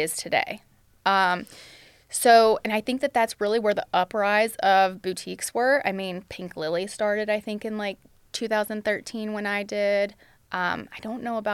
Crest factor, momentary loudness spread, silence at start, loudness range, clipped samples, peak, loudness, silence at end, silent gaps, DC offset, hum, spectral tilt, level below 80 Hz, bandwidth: 18 dB; 12 LU; 0 s; 6 LU; under 0.1%; -6 dBFS; -24 LUFS; 0 s; none; under 0.1%; none; -3.5 dB/octave; -62 dBFS; 16 kHz